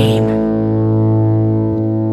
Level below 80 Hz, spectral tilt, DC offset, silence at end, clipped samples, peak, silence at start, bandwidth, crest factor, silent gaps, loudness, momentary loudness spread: -38 dBFS; -9 dB/octave; under 0.1%; 0 s; under 0.1%; -2 dBFS; 0 s; 10.5 kHz; 12 dB; none; -14 LUFS; 3 LU